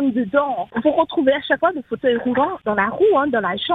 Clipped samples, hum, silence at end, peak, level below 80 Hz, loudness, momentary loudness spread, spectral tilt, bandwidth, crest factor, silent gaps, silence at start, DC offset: under 0.1%; none; 0 s; -4 dBFS; -56 dBFS; -19 LUFS; 4 LU; -7.5 dB/octave; 4.2 kHz; 16 dB; none; 0 s; under 0.1%